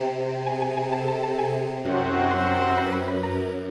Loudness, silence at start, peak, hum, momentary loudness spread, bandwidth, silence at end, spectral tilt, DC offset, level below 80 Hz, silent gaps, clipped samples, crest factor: -25 LUFS; 0 s; -12 dBFS; none; 5 LU; 11.5 kHz; 0 s; -7 dB/octave; under 0.1%; -54 dBFS; none; under 0.1%; 14 dB